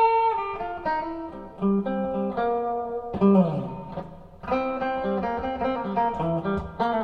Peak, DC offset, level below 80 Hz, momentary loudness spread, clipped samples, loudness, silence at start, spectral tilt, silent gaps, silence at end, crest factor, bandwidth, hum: -8 dBFS; under 0.1%; -50 dBFS; 14 LU; under 0.1%; -26 LUFS; 0 s; -9.5 dB/octave; none; 0 s; 18 dB; 5.4 kHz; none